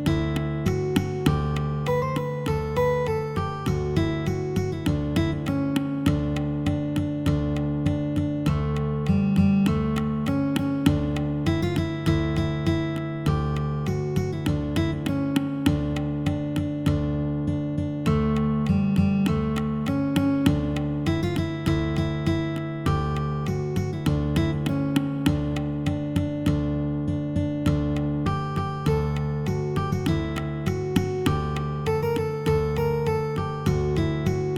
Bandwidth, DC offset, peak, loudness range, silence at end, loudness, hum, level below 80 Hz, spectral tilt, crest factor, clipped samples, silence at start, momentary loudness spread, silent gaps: 15.5 kHz; under 0.1%; -4 dBFS; 2 LU; 0 s; -25 LUFS; none; -38 dBFS; -7.5 dB/octave; 20 dB; under 0.1%; 0 s; 4 LU; none